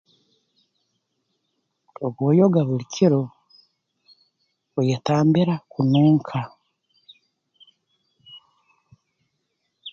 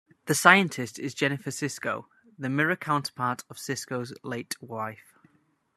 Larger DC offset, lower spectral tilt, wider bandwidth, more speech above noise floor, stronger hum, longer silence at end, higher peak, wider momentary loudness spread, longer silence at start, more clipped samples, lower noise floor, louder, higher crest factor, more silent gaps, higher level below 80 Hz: neither; first, -8 dB/octave vs -4 dB/octave; second, 7.2 kHz vs 13.5 kHz; first, 56 dB vs 40 dB; neither; second, 0 s vs 0.8 s; second, -6 dBFS vs -2 dBFS; about the same, 14 LU vs 16 LU; first, 2 s vs 0.25 s; neither; first, -75 dBFS vs -68 dBFS; first, -21 LUFS vs -27 LUFS; second, 18 dB vs 28 dB; neither; first, -64 dBFS vs -74 dBFS